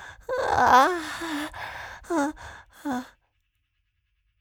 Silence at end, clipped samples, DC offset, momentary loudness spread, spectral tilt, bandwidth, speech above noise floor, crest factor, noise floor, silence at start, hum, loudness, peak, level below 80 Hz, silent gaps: 1.35 s; under 0.1%; under 0.1%; 20 LU; -3.5 dB/octave; over 20 kHz; 51 dB; 22 dB; -74 dBFS; 0 s; none; -24 LUFS; -4 dBFS; -54 dBFS; none